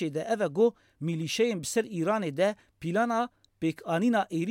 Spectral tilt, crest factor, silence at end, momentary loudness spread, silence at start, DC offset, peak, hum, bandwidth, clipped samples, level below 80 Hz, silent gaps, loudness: -5.5 dB/octave; 16 dB; 0 s; 7 LU; 0 s; under 0.1%; -14 dBFS; none; 16.5 kHz; under 0.1%; -70 dBFS; none; -29 LUFS